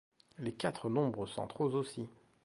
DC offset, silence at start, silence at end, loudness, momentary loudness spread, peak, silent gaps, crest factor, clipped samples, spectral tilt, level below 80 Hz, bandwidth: under 0.1%; 0.4 s; 0.3 s; -37 LUFS; 10 LU; -18 dBFS; none; 18 dB; under 0.1%; -6.5 dB/octave; -70 dBFS; 11.5 kHz